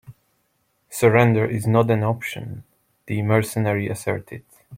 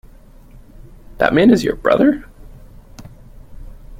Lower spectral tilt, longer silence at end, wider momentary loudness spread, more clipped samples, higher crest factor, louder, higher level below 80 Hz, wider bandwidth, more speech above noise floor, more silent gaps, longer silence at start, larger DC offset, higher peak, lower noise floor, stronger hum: about the same, -6.5 dB/octave vs -6.5 dB/octave; about the same, 0 s vs 0.05 s; first, 19 LU vs 7 LU; neither; about the same, 20 dB vs 18 dB; second, -21 LUFS vs -15 LUFS; second, -58 dBFS vs -38 dBFS; about the same, 16.5 kHz vs 15.5 kHz; first, 48 dB vs 28 dB; neither; second, 0.1 s vs 1.2 s; neither; about the same, -2 dBFS vs 0 dBFS; first, -68 dBFS vs -42 dBFS; neither